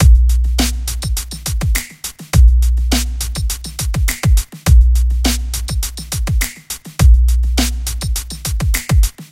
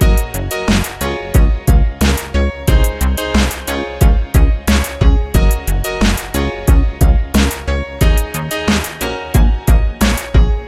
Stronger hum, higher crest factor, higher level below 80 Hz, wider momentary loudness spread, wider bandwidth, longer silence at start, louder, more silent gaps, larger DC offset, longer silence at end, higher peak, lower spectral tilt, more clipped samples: neither; about the same, 14 dB vs 12 dB; about the same, -14 dBFS vs -14 dBFS; first, 10 LU vs 6 LU; about the same, 17 kHz vs 15.5 kHz; about the same, 0 s vs 0 s; about the same, -16 LUFS vs -15 LUFS; neither; neither; about the same, 0.1 s vs 0 s; about the same, 0 dBFS vs 0 dBFS; second, -4 dB/octave vs -5.5 dB/octave; neither